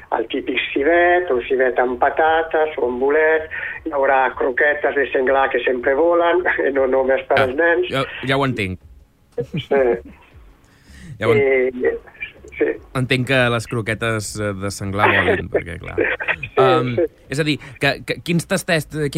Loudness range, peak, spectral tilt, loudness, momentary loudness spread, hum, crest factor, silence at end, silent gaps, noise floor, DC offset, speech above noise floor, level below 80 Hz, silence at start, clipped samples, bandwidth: 4 LU; -2 dBFS; -5.5 dB/octave; -18 LUFS; 9 LU; none; 16 dB; 0 s; none; -48 dBFS; under 0.1%; 30 dB; -46 dBFS; 0.1 s; under 0.1%; 16 kHz